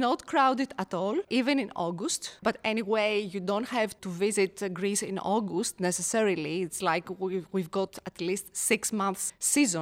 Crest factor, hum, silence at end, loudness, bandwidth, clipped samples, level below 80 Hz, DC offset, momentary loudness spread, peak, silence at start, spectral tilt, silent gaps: 18 dB; none; 0 s; -29 LUFS; 16.5 kHz; under 0.1%; -68 dBFS; under 0.1%; 7 LU; -10 dBFS; 0 s; -3.5 dB/octave; none